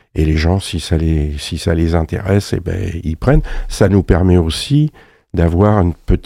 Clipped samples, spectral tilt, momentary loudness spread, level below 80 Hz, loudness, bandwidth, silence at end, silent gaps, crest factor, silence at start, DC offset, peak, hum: under 0.1%; -7 dB/octave; 8 LU; -24 dBFS; -15 LUFS; 14 kHz; 0 s; none; 14 dB; 0.15 s; under 0.1%; 0 dBFS; none